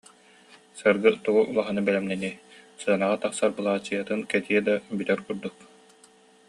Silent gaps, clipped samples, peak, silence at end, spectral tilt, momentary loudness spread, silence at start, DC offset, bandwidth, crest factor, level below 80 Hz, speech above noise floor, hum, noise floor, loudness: none; under 0.1%; -6 dBFS; 1 s; -5 dB/octave; 12 LU; 0.75 s; under 0.1%; 11.5 kHz; 20 dB; -68 dBFS; 31 dB; none; -56 dBFS; -26 LUFS